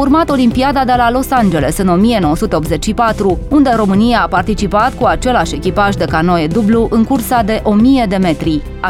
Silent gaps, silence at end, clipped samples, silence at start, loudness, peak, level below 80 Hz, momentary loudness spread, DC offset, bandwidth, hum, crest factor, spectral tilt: none; 0 s; under 0.1%; 0 s; -12 LUFS; 0 dBFS; -26 dBFS; 4 LU; under 0.1%; 16.5 kHz; none; 12 dB; -6 dB/octave